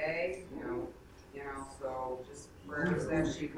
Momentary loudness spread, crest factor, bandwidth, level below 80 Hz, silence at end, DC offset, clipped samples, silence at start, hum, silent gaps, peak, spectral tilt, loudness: 17 LU; 18 dB; 14 kHz; -56 dBFS; 0 s; under 0.1%; under 0.1%; 0 s; none; none; -20 dBFS; -6 dB/octave; -38 LUFS